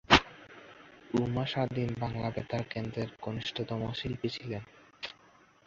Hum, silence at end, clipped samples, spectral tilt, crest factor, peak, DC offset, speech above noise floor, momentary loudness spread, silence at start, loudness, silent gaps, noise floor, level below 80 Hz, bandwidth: none; 0.55 s; under 0.1%; -3.5 dB/octave; 28 dB; -6 dBFS; under 0.1%; 27 dB; 19 LU; 0.1 s; -34 LUFS; none; -61 dBFS; -52 dBFS; 7.6 kHz